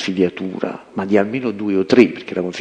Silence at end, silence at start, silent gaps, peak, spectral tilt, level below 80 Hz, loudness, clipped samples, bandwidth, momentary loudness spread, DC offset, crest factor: 0 s; 0 s; none; 0 dBFS; -6.5 dB/octave; -60 dBFS; -18 LUFS; under 0.1%; 9.4 kHz; 12 LU; under 0.1%; 18 dB